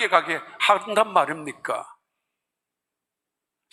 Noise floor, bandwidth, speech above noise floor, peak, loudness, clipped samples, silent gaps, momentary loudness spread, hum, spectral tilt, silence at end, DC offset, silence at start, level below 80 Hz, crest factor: -86 dBFS; 14.5 kHz; 63 dB; -2 dBFS; -23 LUFS; under 0.1%; none; 11 LU; none; -2.5 dB/octave; 1.85 s; under 0.1%; 0 s; -78 dBFS; 24 dB